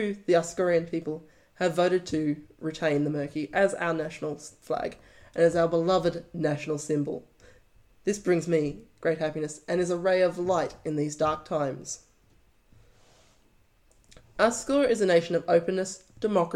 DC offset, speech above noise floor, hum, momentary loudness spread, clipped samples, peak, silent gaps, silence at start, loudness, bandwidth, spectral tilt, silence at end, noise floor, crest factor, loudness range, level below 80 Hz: under 0.1%; 36 dB; none; 11 LU; under 0.1%; -8 dBFS; none; 0 s; -27 LUFS; 12.5 kHz; -5.5 dB/octave; 0 s; -62 dBFS; 20 dB; 5 LU; -60 dBFS